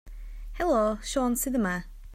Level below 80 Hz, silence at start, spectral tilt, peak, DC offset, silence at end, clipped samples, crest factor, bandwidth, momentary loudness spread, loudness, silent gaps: -42 dBFS; 0.05 s; -4.5 dB/octave; -14 dBFS; under 0.1%; 0 s; under 0.1%; 14 dB; 16 kHz; 20 LU; -28 LUFS; none